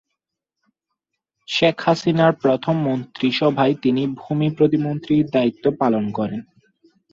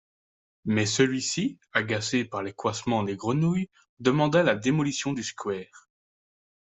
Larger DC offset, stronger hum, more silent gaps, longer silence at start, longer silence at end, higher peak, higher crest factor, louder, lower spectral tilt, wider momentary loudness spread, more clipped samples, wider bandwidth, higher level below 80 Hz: neither; neither; second, none vs 3.89-3.97 s; first, 1.5 s vs 0.65 s; second, 0.7 s vs 0.95 s; first, -2 dBFS vs -8 dBFS; about the same, 18 dB vs 20 dB; first, -19 LUFS vs -26 LUFS; first, -7 dB/octave vs -5 dB/octave; second, 7 LU vs 10 LU; neither; about the same, 7.6 kHz vs 8.2 kHz; about the same, -60 dBFS vs -64 dBFS